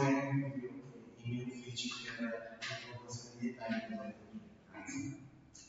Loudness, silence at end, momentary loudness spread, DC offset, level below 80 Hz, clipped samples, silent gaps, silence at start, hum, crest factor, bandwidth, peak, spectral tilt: -42 LUFS; 0 s; 15 LU; under 0.1%; -74 dBFS; under 0.1%; none; 0 s; none; 22 dB; 8 kHz; -20 dBFS; -5 dB/octave